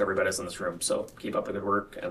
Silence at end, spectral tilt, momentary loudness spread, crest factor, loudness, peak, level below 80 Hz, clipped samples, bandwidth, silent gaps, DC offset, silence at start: 0 s; -3.5 dB/octave; 5 LU; 18 dB; -30 LUFS; -12 dBFS; -58 dBFS; under 0.1%; 14.5 kHz; none; under 0.1%; 0 s